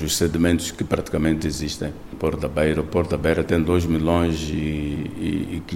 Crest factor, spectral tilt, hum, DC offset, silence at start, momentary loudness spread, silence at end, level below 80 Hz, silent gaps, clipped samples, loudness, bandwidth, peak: 18 dB; -5.5 dB/octave; none; 0.2%; 0 s; 7 LU; 0 s; -36 dBFS; none; under 0.1%; -23 LUFS; 16 kHz; -4 dBFS